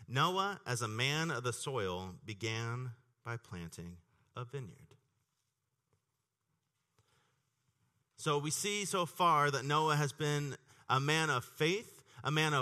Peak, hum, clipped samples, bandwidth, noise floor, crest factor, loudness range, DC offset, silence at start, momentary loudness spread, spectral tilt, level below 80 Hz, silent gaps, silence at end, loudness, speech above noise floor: -16 dBFS; none; under 0.1%; 13 kHz; -86 dBFS; 20 dB; 19 LU; under 0.1%; 0 s; 17 LU; -4 dB/octave; -74 dBFS; none; 0 s; -35 LUFS; 51 dB